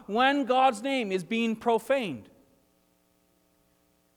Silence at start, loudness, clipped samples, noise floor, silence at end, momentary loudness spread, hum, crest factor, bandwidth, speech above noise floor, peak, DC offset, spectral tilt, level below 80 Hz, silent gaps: 0 s; -26 LUFS; under 0.1%; -68 dBFS; 1.95 s; 6 LU; none; 18 dB; 19 kHz; 42 dB; -10 dBFS; under 0.1%; -4.5 dB/octave; -72 dBFS; none